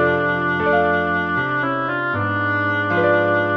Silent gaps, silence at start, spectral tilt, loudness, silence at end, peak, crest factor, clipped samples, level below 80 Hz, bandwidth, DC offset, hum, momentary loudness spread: none; 0 s; -8 dB/octave; -19 LUFS; 0 s; -6 dBFS; 14 dB; under 0.1%; -52 dBFS; 6.2 kHz; 0.1%; none; 4 LU